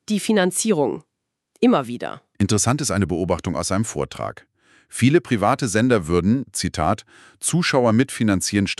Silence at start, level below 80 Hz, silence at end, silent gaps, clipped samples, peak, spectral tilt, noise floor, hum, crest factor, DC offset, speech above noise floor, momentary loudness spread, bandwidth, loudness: 0.1 s; -46 dBFS; 0.05 s; none; under 0.1%; -4 dBFS; -5 dB/octave; -66 dBFS; none; 18 dB; under 0.1%; 46 dB; 10 LU; 13.5 kHz; -20 LUFS